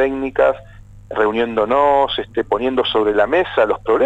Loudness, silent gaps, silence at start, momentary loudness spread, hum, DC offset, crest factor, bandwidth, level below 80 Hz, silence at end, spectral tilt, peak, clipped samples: -17 LUFS; none; 0 s; 6 LU; 50 Hz at -45 dBFS; under 0.1%; 14 dB; 8 kHz; -44 dBFS; 0 s; -6 dB/octave; -2 dBFS; under 0.1%